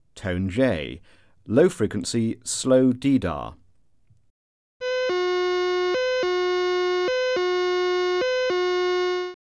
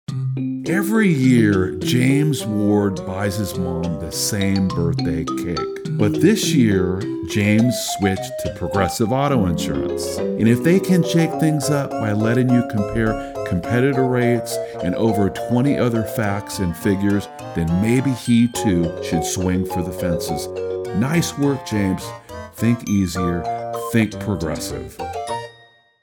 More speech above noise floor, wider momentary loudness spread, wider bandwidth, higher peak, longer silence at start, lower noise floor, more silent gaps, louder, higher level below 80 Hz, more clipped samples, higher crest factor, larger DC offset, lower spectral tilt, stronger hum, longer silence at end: first, 40 dB vs 32 dB; about the same, 9 LU vs 9 LU; second, 11 kHz vs over 20 kHz; about the same, -6 dBFS vs -4 dBFS; about the same, 0.15 s vs 0.1 s; first, -63 dBFS vs -51 dBFS; first, 4.30-4.80 s vs none; second, -23 LUFS vs -20 LUFS; second, -54 dBFS vs -46 dBFS; neither; about the same, 18 dB vs 16 dB; neither; about the same, -5 dB/octave vs -6 dB/octave; neither; second, 0.25 s vs 0.5 s